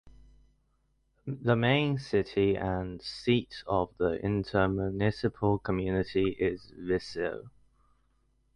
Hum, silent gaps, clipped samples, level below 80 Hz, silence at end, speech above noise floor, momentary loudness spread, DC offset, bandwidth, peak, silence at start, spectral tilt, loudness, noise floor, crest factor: none; none; under 0.1%; -50 dBFS; 1.05 s; 43 dB; 8 LU; under 0.1%; 10.5 kHz; -12 dBFS; 0.05 s; -7.5 dB/octave; -30 LUFS; -72 dBFS; 18 dB